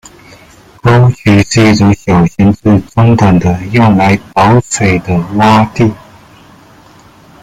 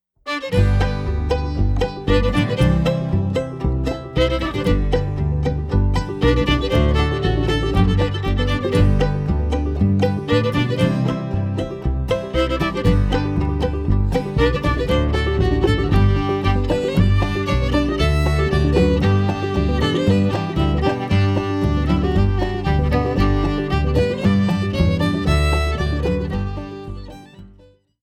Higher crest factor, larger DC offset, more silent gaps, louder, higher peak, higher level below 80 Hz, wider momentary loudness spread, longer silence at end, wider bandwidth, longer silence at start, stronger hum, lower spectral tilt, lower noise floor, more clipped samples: about the same, 10 dB vs 14 dB; neither; neither; first, -9 LUFS vs -19 LUFS; first, 0 dBFS vs -4 dBFS; second, -34 dBFS vs -24 dBFS; about the same, 5 LU vs 5 LU; first, 1.45 s vs 0.55 s; about the same, 12 kHz vs 12 kHz; first, 0.85 s vs 0.25 s; neither; about the same, -6.5 dB/octave vs -7.5 dB/octave; second, -39 dBFS vs -50 dBFS; neither